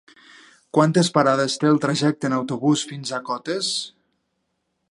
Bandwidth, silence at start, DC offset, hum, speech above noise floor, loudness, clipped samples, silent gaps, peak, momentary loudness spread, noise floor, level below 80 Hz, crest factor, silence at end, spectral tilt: 11.5 kHz; 0.75 s; under 0.1%; none; 53 dB; -21 LUFS; under 0.1%; none; -2 dBFS; 10 LU; -74 dBFS; -70 dBFS; 20 dB; 1 s; -5 dB/octave